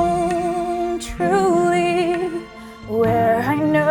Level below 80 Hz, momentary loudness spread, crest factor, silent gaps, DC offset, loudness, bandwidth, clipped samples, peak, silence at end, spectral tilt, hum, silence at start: -42 dBFS; 10 LU; 14 dB; none; under 0.1%; -19 LUFS; 18 kHz; under 0.1%; -6 dBFS; 0 s; -6 dB/octave; none; 0 s